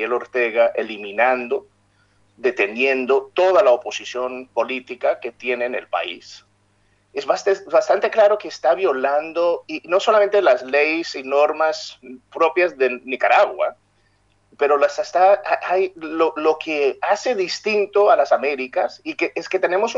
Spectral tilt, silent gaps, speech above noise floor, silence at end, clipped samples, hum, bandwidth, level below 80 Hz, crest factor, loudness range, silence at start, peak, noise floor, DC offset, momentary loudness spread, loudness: -3 dB/octave; none; 42 dB; 0 s; under 0.1%; none; 7.8 kHz; -70 dBFS; 18 dB; 4 LU; 0 s; -2 dBFS; -61 dBFS; under 0.1%; 10 LU; -19 LUFS